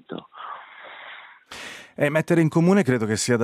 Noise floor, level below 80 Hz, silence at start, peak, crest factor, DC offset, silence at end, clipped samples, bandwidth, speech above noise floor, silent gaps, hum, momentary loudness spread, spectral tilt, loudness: -43 dBFS; -66 dBFS; 0.1 s; -6 dBFS; 16 dB; under 0.1%; 0 s; under 0.1%; 14.5 kHz; 24 dB; none; none; 22 LU; -5.5 dB/octave; -20 LUFS